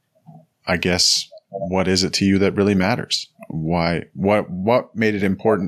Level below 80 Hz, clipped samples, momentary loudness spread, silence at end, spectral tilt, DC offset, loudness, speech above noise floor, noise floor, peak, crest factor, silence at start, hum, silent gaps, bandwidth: -54 dBFS; under 0.1%; 9 LU; 0 s; -4.5 dB/octave; under 0.1%; -19 LUFS; 29 dB; -47 dBFS; -4 dBFS; 16 dB; 0.3 s; none; none; 14 kHz